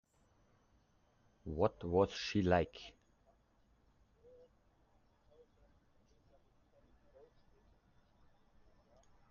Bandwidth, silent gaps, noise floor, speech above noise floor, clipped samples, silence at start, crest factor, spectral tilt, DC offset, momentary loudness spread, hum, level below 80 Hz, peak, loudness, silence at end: 7 kHz; none; -73 dBFS; 37 dB; under 0.1%; 1.45 s; 26 dB; -5 dB/octave; under 0.1%; 21 LU; none; -66 dBFS; -18 dBFS; -36 LUFS; 6.4 s